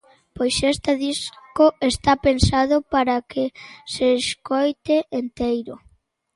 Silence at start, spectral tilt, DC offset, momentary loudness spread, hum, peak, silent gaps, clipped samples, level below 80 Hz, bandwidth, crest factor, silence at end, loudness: 0.35 s; -5 dB/octave; under 0.1%; 10 LU; none; -2 dBFS; none; under 0.1%; -38 dBFS; 11.5 kHz; 20 dB; 0.6 s; -21 LUFS